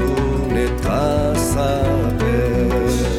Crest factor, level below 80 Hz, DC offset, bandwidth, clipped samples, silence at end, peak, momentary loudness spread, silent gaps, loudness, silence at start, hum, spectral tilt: 12 dB; -24 dBFS; under 0.1%; 16.5 kHz; under 0.1%; 0 s; -6 dBFS; 2 LU; none; -18 LUFS; 0 s; none; -6 dB/octave